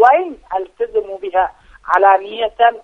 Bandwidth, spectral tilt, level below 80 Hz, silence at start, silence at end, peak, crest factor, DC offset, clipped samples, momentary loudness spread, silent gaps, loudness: 6.4 kHz; -4 dB/octave; -50 dBFS; 0 s; 0.05 s; 0 dBFS; 16 dB; under 0.1%; under 0.1%; 12 LU; none; -16 LUFS